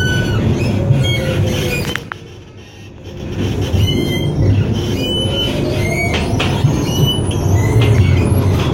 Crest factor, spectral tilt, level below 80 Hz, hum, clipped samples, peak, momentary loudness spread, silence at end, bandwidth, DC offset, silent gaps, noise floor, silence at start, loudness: 14 dB; -6 dB/octave; -28 dBFS; none; under 0.1%; 0 dBFS; 16 LU; 0 s; 16 kHz; under 0.1%; none; -35 dBFS; 0 s; -15 LUFS